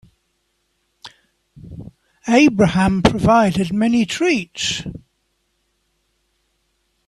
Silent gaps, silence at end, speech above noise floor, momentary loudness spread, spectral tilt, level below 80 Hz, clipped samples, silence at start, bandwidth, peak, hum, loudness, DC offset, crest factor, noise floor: none; 2.1 s; 53 dB; 22 LU; -5.5 dB/octave; -42 dBFS; under 0.1%; 1.05 s; 12.5 kHz; 0 dBFS; none; -16 LUFS; under 0.1%; 20 dB; -68 dBFS